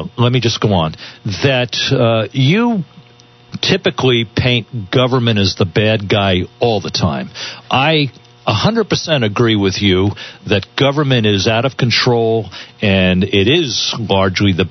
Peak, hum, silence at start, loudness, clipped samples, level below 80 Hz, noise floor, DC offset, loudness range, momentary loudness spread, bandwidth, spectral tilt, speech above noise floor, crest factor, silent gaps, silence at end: 0 dBFS; none; 0 s; -14 LUFS; under 0.1%; -46 dBFS; -44 dBFS; under 0.1%; 2 LU; 7 LU; 6.4 kHz; -5.5 dB/octave; 30 dB; 14 dB; none; 0 s